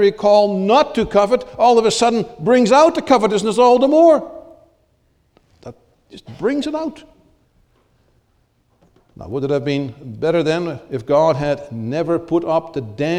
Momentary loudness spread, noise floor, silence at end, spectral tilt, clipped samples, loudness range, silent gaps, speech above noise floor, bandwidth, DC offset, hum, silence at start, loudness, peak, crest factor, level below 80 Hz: 13 LU; -61 dBFS; 0 s; -5.5 dB/octave; under 0.1%; 14 LU; none; 45 dB; 11.5 kHz; under 0.1%; none; 0 s; -16 LUFS; 0 dBFS; 16 dB; -50 dBFS